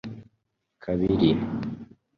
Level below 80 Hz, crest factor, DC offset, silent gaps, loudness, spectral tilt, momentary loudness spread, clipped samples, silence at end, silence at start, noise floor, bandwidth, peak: -48 dBFS; 20 dB; under 0.1%; none; -25 LUFS; -9 dB/octave; 20 LU; under 0.1%; 0.3 s; 0.05 s; -76 dBFS; 6.4 kHz; -8 dBFS